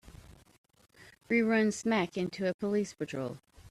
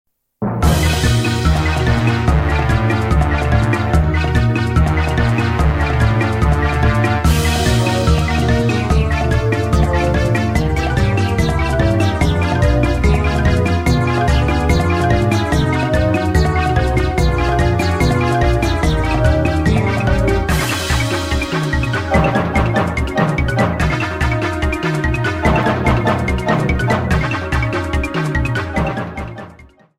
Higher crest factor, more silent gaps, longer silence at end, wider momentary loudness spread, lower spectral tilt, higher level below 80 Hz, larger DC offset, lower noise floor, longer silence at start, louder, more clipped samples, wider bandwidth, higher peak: about the same, 16 dB vs 14 dB; first, 0.58-0.64 s, 2.54-2.59 s vs none; second, 0 s vs 0.35 s; first, 11 LU vs 3 LU; about the same, -5.5 dB/octave vs -6 dB/octave; second, -64 dBFS vs -20 dBFS; neither; first, -54 dBFS vs -42 dBFS; second, 0.05 s vs 0.4 s; second, -31 LUFS vs -16 LUFS; neither; second, 12.5 kHz vs 16 kHz; second, -18 dBFS vs 0 dBFS